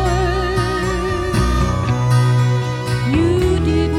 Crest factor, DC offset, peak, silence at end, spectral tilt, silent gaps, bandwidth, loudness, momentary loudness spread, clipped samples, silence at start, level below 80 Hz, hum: 12 dB; under 0.1%; -4 dBFS; 0 s; -6.5 dB/octave; none; 13 kHz; -17 LUFS; 5 LU; under 0.1%; 0 s; -24 dBFS; none